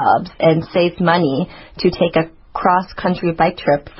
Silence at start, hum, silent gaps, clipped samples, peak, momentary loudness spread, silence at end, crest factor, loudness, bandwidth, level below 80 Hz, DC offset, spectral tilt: 0 s; none; none; under 0.1%; 0 dBFS; 6 LU; 0.1 s; 16 dB; -17 LUFS; 5.8 kHz; -44 dBFS; under 0.1%; -10.5 dB/octave